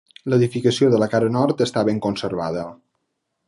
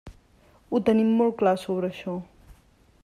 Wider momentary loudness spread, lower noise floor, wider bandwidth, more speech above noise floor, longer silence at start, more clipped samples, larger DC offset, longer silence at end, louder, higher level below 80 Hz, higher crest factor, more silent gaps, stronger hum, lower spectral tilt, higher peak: second, 9 LU vs 13 LU; first, -75 dBFS vs -58 dBFS; about the same, 11.5 kHz vs 11.5 kHz; first, 56 dB vs 35 dB; first, 0.25 s vs 0.05 s; neither; neither; first, 0.75 s vs 0.5 s; first, -20 LUFS vs -24 LUFS; about the same, -56 dBFS vs -56 dBFS; about the same, 16 dB vs 18 dB; neither; neither; about the same, -6.5 dB/octave vs -7.5 dB/octave; first, -4 dBFS vs -8 dBFS